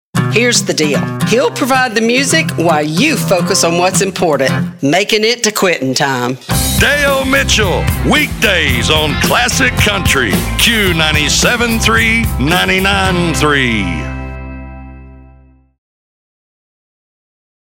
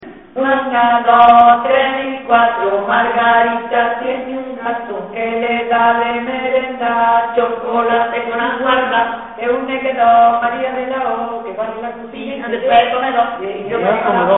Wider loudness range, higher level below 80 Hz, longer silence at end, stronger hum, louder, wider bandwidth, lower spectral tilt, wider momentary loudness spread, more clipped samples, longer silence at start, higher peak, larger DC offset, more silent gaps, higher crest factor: about the same, 5 LU vs 6 LU; first, -26 dBFS vs -52 dBFS; first, 2.5 s vs 0 s; neither; first, -11 LUFS vs -14 LUFS; first, over 20 kHz vs 4 kHz; first, -3.5 dB/octave vs -1.5 dB/octave; second, 5 LU vs 13 LU; neither; first, 0.15 s vs 0 s; about the same, 0 dBFS vs 0 dBFS; second, under 0.1% vs 0.2%; neither; about the same, 12 dB vs 14 dB